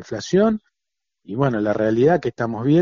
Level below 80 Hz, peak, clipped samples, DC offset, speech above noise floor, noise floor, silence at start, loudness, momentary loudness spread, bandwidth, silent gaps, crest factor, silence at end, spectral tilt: -54 dBFS; -4 dBFS; under 0.1%; under 0.1%; 66 dB; -85 dBFS; 0 s; -20 LUFS; 8 LU; 7.4 kHz; none; 16 dB; 0 s; -7 dB/octave